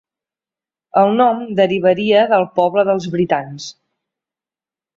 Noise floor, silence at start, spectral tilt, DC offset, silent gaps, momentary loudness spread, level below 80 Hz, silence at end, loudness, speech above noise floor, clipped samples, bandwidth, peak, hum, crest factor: under -90 dBFS; 0.95 s; -6 dB/octave; under 0.1%; none; 8 LU; -60 dBFS; 1.25 s; -15 LUFS; over 75 dB; under 0.1%; 7.6 kHz; -2 dBFS; none; 16 dB